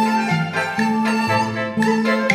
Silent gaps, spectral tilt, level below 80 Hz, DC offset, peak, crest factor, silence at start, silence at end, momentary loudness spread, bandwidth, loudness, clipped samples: none; -5.5 dB/octave; -60 dBFS; under 0.1%; -2 dBFS; 16 dB; 0 s; 0 s; 2 LU; 15.5 kHz; -19 LUFS; under 0.1%